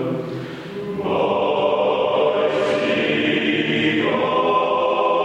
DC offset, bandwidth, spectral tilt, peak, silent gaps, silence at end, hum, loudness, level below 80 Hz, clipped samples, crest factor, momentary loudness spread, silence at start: under 0.1%; 9.8 kHz; -6 dB/octave; -6 dBFS; none; 0 s; none; -19 LUFS; -60 dBFS; under 0.1%; 14 dB; 9 LU; 0 s